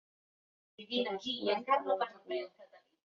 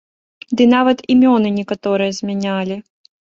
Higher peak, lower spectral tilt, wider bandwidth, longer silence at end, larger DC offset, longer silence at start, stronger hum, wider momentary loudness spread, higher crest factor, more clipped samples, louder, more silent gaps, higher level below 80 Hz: second, -18 dBFS vs -2 dBFS; second, -1 dB/octave vs -6 dB/octave; about the same, 7.2 kHz vs 7.4 kHz; about the same, 0.3 s vs 0.4 s; neither; first, 0.8 s vs 0.5 s; neither; about the same, 10 LU vs 11 LU; first, 20 dB vs 14 dB; neither; second, -35 LUFS vs -16 LUFS; neither; second, -84 dBFS vs -58 dBFS